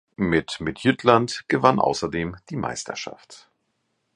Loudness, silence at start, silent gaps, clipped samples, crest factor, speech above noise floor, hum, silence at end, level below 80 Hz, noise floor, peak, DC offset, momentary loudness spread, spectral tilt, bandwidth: -23 LUFS; 0.2 s; none; under 0.1%; 24 dB; 51 dB; none; 0.8 s; -50 dBFS; -73 dBFS; 0 dBFS; under 0.1%; 12 LU; -5 dB/octave; 11 kHz